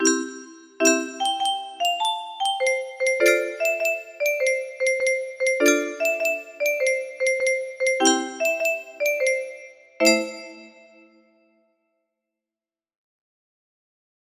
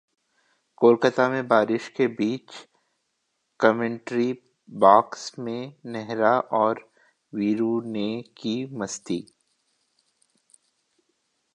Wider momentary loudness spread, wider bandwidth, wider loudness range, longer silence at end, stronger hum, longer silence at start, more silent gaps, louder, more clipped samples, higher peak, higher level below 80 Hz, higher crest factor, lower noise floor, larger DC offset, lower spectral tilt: second, 7 LU vs 16 LU; first, 15.5 kHz vs 10.5 kHz; second, 5 LU vs 8 LU; first, 3.55 s vs 2.3 s; neither; second, 0 s vs 0.8 s; neither; about the same, -22 LUFS vs -24 LUFS; neither; about the same, -4 dBFS vs -2 dBFS; about the same, -74 dBFS vs -72 dBFS; about the same, 22 dB vs 24 dB; first, under -90 dBFS vs -76 dBFS; neither; second, -0.5 dB/octave vs -5.5 dB/octave